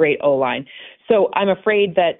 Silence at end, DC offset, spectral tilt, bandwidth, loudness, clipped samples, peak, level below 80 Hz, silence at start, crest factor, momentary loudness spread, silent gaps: 0.05 s; under 0.1%; -10 dB/octave; 4 kHz; -18 LUFS; under 0.1%; -4 dBFS; -60 dBFS; 0 s; 14 dB; 14 LU; none